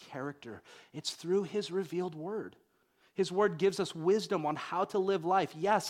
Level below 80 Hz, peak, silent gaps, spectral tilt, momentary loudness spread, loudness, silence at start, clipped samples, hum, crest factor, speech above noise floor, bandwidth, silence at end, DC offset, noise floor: -78 dBFS; -14 dBFS; none; -5 dB/octave; 14 LU; -33 LUFS; 0 s; under 0.1%; none; 18 dB; 38 dB; 14.5 kHz; 0 s; under 0.1%; -71 dBFS